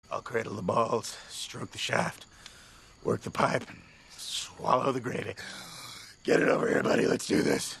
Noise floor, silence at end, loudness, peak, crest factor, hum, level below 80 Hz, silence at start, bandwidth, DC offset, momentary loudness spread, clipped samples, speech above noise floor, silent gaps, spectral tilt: -54 dBFS; 0 s; -30 LUFS; -8 dBFS; 22 dB; none; -62 dBFS; 0.1 s; 12.5 kHz; under 0.1%; 17 LU; under 0.1%; 25 dB; none; -4.5 dB/octave